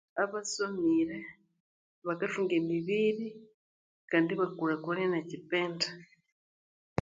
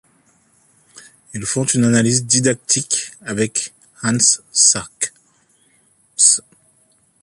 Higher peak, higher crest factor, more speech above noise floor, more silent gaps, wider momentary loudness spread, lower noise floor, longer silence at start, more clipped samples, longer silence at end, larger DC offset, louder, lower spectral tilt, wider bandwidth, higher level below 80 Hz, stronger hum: second, -12 dBFS vs 0 dBFS; about the same, 22 dB vs 20 dB; first, over 59 dB vs 41 dB; first, 1.60-2.02 s, 3.54-4.08 s vs none; second, 10 LU vs 13 LU; first, under -90 dBFS vs -58 dBFS; second, 0.15 s vs 0.95 s; neither; about the same, 0.95 s vs 0.85 s; neither; second, -32 LUFS vs -15 LUFS; first, -5 dB/octave vs -2.5 dB/octave; second, 9.4 kHz vs 11.5 kHz; second, -68 dBFS vs -56 dBFS; neither